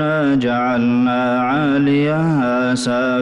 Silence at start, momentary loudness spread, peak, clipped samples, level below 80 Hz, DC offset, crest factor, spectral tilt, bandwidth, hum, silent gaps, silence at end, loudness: 0 s; 2 LU; -8 dBFS; under 0.1%; -52 dBFS; under 0.1%; 8 dB; -6.5 dB/octave; 11.5 kHz; none; none; 0 s; -16 LUFS